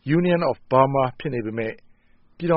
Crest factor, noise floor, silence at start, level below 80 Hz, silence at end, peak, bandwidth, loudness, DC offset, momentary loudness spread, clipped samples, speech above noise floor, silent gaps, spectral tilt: 20 dB; -55 dBFS; 0.05 s; -54 dBFS; 0 s; -2 dBFS; 5.4 kHz; -22 LUFS; under 0.1%; 11 LU; under 0.1%; 33 dB; none; -6.5 dB/octave